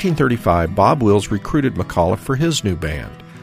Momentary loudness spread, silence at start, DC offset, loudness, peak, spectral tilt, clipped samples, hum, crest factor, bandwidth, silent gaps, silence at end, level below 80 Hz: 9 LU; 0 s; under 0.1%; -17 LUFS; 0 dBFS; -6 dB/octave; under 0.1%; none; 16 dB; 15.5 kHz; none; 0 s; -36 dBFS